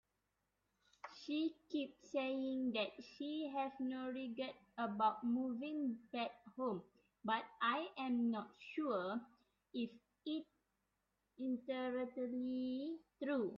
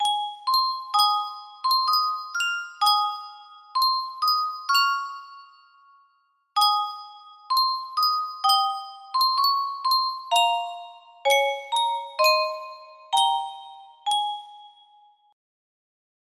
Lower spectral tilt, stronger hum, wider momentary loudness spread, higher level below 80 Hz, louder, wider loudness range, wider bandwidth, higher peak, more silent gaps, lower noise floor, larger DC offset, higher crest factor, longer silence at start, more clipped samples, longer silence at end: first, -3 dB/octave vs 3 dB/octave; neither; second, 9 LU vs 15 LU; about the same, -84 dBFS vs -80 dBFS; second, -43 LUFS vs -23 LUFS; about the same, 4 LU vs 4 LU; second, 7.2 kHz vs 15.5 kHz; second, -24 dBFS vs -8 dBFS; neither; first, -87 dBFS vs -67 dBFS; neither; about the same, 18 dB vs 18 dB; first, 1.05 s vs 0 s; neither; second, 0 s vs 1.65 s